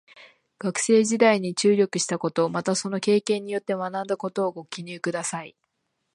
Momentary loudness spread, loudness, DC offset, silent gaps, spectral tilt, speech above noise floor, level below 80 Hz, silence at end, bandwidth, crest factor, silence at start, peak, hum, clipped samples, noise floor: 11 LU; -24 LUFS; under 0.1%; none; -4 dB/octave; 52 dB; -74 dBFS; 0.65 s; 11.5 kHz; 20 dB; 0.2 s; -6 dBFS; none; under 0.1%; -76 dBFS